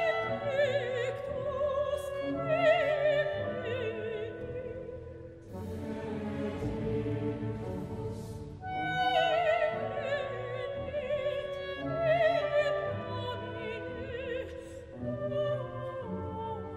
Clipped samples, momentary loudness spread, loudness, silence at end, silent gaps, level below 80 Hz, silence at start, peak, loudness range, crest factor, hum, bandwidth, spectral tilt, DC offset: under 0.1%; 13 LU; -33 LUFS; 0 s; none; -54 dBFS; 0 s; -14 dBFS; 7 LU; 18 dB; none; 12.5 kHz; -6.5 dB/octave; under 0.1%